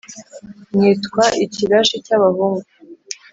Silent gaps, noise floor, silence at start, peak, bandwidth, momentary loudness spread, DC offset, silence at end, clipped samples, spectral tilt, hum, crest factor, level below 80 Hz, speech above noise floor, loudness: none; -38 dBFS; 0.1 s; -2 dBFS; 8 kHz; 17 LU; under 0.1%; 0.2 s; under 0.1%; -4.5 dB/octave; none; 16 dB; -58 dBFS; 23 dB; -16 LUFS